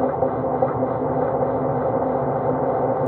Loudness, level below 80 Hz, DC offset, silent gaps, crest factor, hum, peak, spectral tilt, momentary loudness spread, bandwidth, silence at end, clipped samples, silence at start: -22 LUFS; -50 dBFS; under 0.1%; none; 16 dB; none; -6 dBFS; -9.5 dB/octave; 1 LU; 3.9 kHz; 0 s; under 0.1%; 0 s